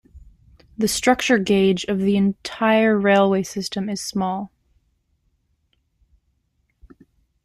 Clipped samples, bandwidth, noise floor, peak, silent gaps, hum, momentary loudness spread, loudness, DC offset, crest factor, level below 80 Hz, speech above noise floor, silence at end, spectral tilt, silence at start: under 0.1%; 15.5 kHz; -69 dBFS; -2 dBFS; none; none; 10 LU; -20 LUFS; under 0.1%; 20 dB; -54 dBFS; 50 dB; 2.95 s; -5 dB/octave; 0.15 s